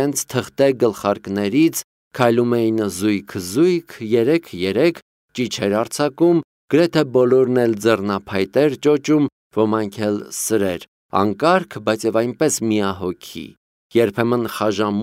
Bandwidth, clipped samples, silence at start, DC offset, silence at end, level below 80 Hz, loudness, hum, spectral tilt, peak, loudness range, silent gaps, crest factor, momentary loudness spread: 16 kHz; under 0.1%; 0 s; under 0.1%; 0 s; -60 dBFS; -19 LUFS; none; -5 dB/octave; 0 dBFS; 3 LU; 1.84-2.11 s, 5.02-5.29 s, 6.44-6.68 s, 9.32-9.51 s, 10.88-11.09 s, 13.57-13.90 s; 18 dB; 8 LU